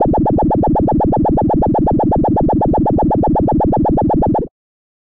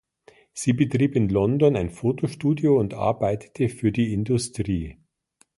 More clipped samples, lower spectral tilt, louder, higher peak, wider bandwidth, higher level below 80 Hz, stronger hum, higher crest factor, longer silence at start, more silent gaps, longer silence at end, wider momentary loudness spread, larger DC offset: neither; first, -13 dB/octave vs -7 dB/octave; first, -14 LUFS vs -23 LUFS; about the same, -4 dBFS vs -6 dBFS; second, 3.7 kHz vs 11.5 kHz; first, -24 dBFS vs -46 dBFS; neither; second, 8 dB vs 18 dB; second, 0 s vs 0.55 s; neither; about the same, 0.55 s vs 0.65 s; second, 0 LU vs 7 LU; first, 1% vs under 0.1%